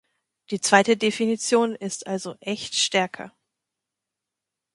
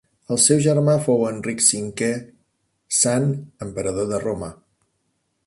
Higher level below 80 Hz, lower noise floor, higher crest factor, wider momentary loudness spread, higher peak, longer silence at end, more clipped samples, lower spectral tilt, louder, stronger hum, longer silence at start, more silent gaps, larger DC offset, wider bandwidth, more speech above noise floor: second, -70 dBFS vs -54 dBFS; first, -86 dBFS vs -71 dBFS; about the same, 24 dB vs 20 dB; about the same, 13 LU vs 14 LU; about the same, 0 dBFS vs -2 dBFS; first, 1.45 s vs 0.95 s; neither; about the same, -3 dB/octave vs -4 dB/octave; second, -23 LUFS vs -20 LUFS; first, 50 Hz at -50 dBFS vs none; first, 0.5 s vs 0.3 s; neither; neither; about the same, 11.5 kHz vs 11.5 kHz; first, 63 dB vs 51 dB